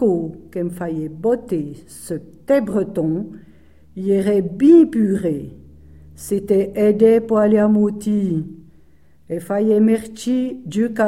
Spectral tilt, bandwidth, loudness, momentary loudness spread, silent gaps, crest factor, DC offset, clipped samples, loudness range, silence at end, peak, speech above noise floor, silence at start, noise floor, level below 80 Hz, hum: -7.5 dB/octave; 14 kHz; -18 LUFS; 16 LU; none; 16 dB; 0.3%; under 0.1%; 6 LU; 0 s; -2 dBFS; 36 dB; 0 s; -53 dBFS; -50 dBFS; none